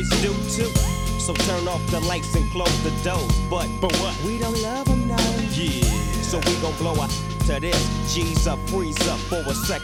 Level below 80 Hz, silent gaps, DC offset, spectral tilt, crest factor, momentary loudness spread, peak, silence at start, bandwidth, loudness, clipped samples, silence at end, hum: -28 dBFS; none; under 0.1%; -4.5 dB/octave; 16 dB; 3 LU; -6 dBFS; 0 s; 17.5 kHz; -23 LUFS; under 0.1%; 0 s; none